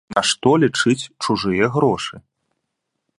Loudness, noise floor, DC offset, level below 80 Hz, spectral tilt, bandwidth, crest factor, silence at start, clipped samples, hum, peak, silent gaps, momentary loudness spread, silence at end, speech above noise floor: -18 LUFS; -77 dBFS; under 0.1%; -54 dBFS; -4.5 dB/octave; 11.5 kHz; 20 dB; 0.1 s; under 0.1%; none; 0 dBFS; none; 7 LU; 1 s; 59 dB